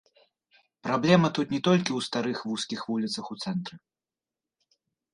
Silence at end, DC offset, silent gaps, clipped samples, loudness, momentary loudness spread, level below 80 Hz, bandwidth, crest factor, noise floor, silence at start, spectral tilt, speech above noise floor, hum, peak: 1.35 s; under 0.1%; none; under 0.1%; -27 LUFS; 11 LU; -68 dBFS; 11 kHz; 24 dB; under -90 dBFS; 0.85 s; -5.5 dB/octave; over 63 dB; none; -6 dBFS